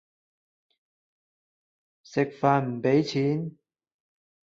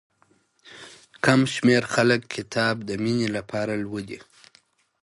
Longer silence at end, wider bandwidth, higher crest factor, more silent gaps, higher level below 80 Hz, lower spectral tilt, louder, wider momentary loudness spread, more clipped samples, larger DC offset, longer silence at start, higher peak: first, 1.1 s vs 0.85 s; second, 7.6 kHz vs 11.5 kHz; about the same, 22 dB vs 20 dB; neither; second, -70 dBFS vs -62 dBFS; first, -7.5 dB/octave vs -5 dB/octave; second, -26 LUFS vs -23 LUFS; second, 9 LU vs 22 LU; neither; neither; first, 2.1 s vs 0.65 s; about the same, -8 dBFS vs -6 dBFS